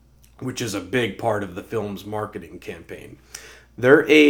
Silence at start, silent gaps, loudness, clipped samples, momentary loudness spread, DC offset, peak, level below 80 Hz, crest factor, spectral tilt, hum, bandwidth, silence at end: 0.4 s; none; -23 LUFS; under 0.1%; 23 LU; under 0.1%; 0 dBFS; -54 dBFS; 22 dB; -5 dB/octave; none; 17 kHz; 0 s